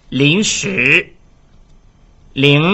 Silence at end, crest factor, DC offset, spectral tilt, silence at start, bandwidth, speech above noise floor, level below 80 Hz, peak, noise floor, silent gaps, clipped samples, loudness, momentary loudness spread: 0 s; 16 dB; under 0.1%; -4 dB/octave; 0.1 s; 8.2 kHz; 33 dB; -46 dBFS; 0 dBFS; -46 dBFS; none; under 0.1%; -12 LUFS; 12 LU